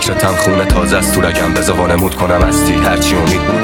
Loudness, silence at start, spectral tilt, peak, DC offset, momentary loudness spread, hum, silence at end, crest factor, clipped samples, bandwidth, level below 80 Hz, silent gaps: -12 LUFS; 0 s; -4.5 dB/octave; 0 dBFS; 0.3%; 1 LU; none; 0 s; 12 dB; under 0.1%; over 20 kHz; -22 dBFS; none